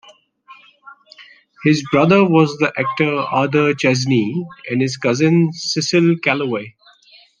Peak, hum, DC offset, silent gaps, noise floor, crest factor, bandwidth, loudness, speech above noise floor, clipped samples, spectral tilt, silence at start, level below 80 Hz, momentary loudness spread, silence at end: 0 dBFS; none; under 0.1%; none; -49 dBFS; 16 dB; 9.8 kHz; -16 LUFS; 33 dB; under 0.1%; -5.5 dB/octave; 0.5 s; -62 dBFS; 9 LU; 0.7 s